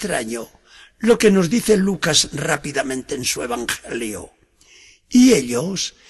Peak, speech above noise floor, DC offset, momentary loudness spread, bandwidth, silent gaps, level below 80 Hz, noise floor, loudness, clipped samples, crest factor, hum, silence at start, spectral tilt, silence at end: -2 dBFS; 32 dB; under 0.1%; 13 LU; 12.5 kHz; none; -48 dBFS; -51 dBFS; -18 LUFS; under 0.1%; 16 dB; none; 0 s; -4 dB/octave; 0.2 s